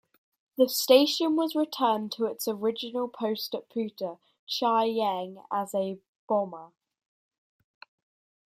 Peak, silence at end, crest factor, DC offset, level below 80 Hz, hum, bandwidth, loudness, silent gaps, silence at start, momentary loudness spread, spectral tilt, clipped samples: -6 dBFS; 1.8 s; 22 dB; under 0.1%; -80 dBFS; none; 16 kHz; -28 LUFS; 4.39-4.47 s, 6.08-6.28 s; 0.6 s; 14 LU; -3.5 dB/octave; under 0.1%